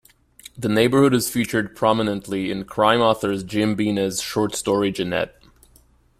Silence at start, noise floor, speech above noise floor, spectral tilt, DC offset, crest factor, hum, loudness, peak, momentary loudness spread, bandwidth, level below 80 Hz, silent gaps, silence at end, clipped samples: 0.55 s; -55 dBFS; 35 dB; -5 dB/octave; under 0.1%; 18 dB; none; -21 LUFS; -2 dBFS; 9 LU; 16 kHz; -52 dBFS; none; 0.9 s; under 0.1%